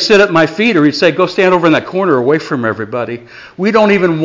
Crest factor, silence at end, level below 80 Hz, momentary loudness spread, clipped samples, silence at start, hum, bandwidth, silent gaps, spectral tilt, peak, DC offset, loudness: 10 dB; 0 s; -50 dBFS; 10 LU; under 0.1%; 0 s; none; 7.6 kHz; none; -5.5 dB/octave; 0 dBFS; under 0.1%; -11 LUFS